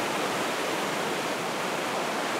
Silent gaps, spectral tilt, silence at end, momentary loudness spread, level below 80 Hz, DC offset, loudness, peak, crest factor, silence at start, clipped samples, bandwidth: none; -2.5 dB/octave; 0 s; 1 LU; -74 dBFS; under 0.1%; -29 LUFS; -16 dBFS; 14 dB; 0 s; under 0.1%; 16 kHz